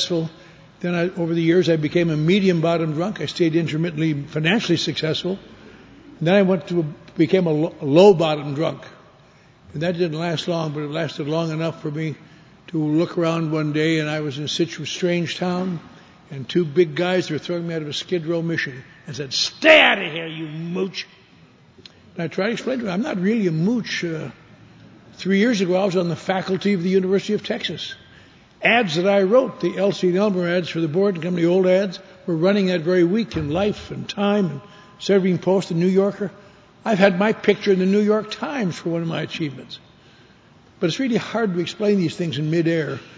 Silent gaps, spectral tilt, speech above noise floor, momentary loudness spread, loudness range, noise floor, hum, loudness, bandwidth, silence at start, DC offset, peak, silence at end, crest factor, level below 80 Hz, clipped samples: none; -6 dB/octave; 31 dB; 12 LU; 6 LU; -51 dBFS; none; -20 LUFS; 8 kHz; 0 s; under 0.1%; 0 dBFS; 0.05 s; 20 dB; -56 dBFS; under 0.1%